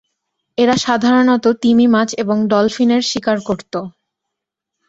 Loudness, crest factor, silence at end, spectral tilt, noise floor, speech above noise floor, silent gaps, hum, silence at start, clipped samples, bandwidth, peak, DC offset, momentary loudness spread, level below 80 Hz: -14 LUFS; 14 dB; 1 s; -4.5 dB/octave; -80 dBFS; 66 dB; none; none; 0.6 s; under 0.1%; 8 kHz; -2 dBFS; under 0.1%; 12 LU; -56 dBFS